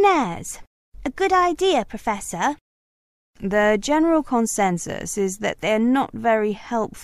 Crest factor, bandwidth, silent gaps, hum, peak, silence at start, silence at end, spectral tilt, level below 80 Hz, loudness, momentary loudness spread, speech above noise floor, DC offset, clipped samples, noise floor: 16 dB; 14.5 kHz; 0.67-0.92 s, 2.61-3.33 s; none; -6 dBFS; 0 s; 0 s; -4 dB/octave; -48 dBFS; -21 LUFS; 13 LU; over 69 dB; under 0.1%; under 0.1%; under -90 dBFS